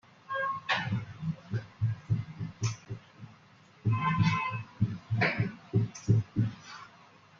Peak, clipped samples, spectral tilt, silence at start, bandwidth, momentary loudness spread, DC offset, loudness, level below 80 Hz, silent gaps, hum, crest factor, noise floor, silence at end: -12 dBFS; under 0.1%; -6 dB/octave; 0.3 s; 7.2 kHz; 18 LU; under 0.1%; -32 LUFS; -60 dBFS; none; none; 20 dB; -58 dBFS; 0.55 s